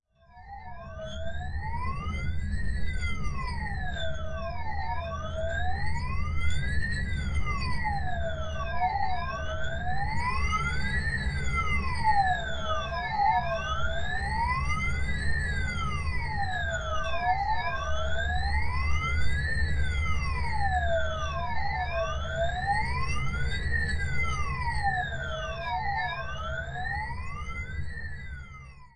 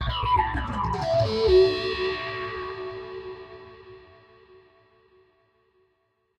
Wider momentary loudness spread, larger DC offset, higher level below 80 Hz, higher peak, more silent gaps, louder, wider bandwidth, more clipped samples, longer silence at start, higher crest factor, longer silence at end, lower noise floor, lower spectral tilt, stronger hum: second, 8 LU vs 23 LU; neither; about the same, -36 dBFS vs -40 dBFS; about the same, -12 dBFS vs -10 dBFS; neither; second, -31 LUFS vs -25 LUFS; first, 9.6 kHz vs 8.6 kHz; neither; first, 0.35 s vs 0 s; about the same, 16 dB vs 18 dB; second, 0.1 s vs 2.4 s; second, -50 dBFS vs -72 dBFS; second, -5 dB/octave vs -6.5 dB/octave; neither